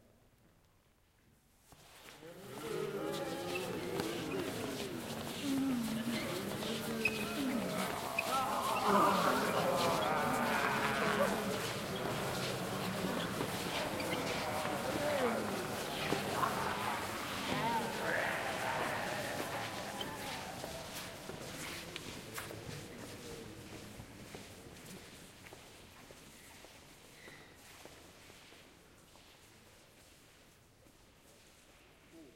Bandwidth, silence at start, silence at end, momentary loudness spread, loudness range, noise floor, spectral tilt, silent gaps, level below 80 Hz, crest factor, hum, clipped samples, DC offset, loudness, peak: 16.5 kHz; 1.7 s; 0.05 s; 21 LU; 21 LU; -70 dBFS; -4 dB/octave; none; -66 dBFS; 22 dB; none; under 0.1%; under 0.1%; -37 LUFS; -16 dBFS